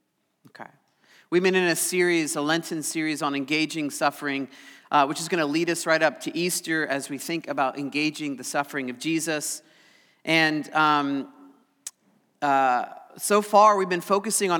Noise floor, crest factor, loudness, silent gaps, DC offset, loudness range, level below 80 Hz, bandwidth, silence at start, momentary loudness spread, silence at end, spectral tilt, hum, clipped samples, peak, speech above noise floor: -66 dBFS; 20 dB; -24 LUFS; none; under 0.1%; 4 LU; under -90 dBFS; 20 kHz; 0.6 s; 11 LU; 0 s; -3.5 dB/octave; none; under 0.1%; -6 dBFS; 41 dB